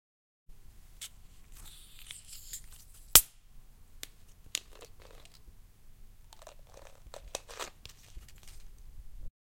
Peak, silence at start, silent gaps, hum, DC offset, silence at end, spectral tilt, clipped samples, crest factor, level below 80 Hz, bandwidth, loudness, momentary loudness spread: 0 dBFS; 0.5 s; none; none; under 0.1%; 0.2 s; 0.5 dB/octave; under 0.1%; 38 dB; -52 dBFS; 16.5 kHz; -28 LUFS; 33 LU